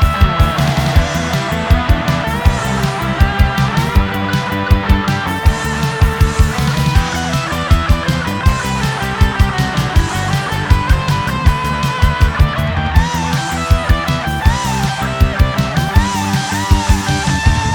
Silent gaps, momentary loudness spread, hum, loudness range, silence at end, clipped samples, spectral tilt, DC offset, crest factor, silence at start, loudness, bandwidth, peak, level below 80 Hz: none; 3 LU; none; 0 LU; 0 s; under 0.1%; -5.5 dB/octave; under 0.1%; 14 dB; 0 s; -15 LUFS; 19.5 kHz; 0 dBFS; -18 dBFS